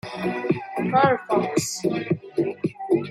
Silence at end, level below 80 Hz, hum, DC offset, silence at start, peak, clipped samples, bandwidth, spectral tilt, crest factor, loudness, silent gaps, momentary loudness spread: 0 s; -64 dBFS; none; under 0.1%; 0.05 s; -4 dBFS; under 0.1%; 14.5 kHz; -5.5 dB/octave; 18 dB; -24 LUFS; none; 8 LU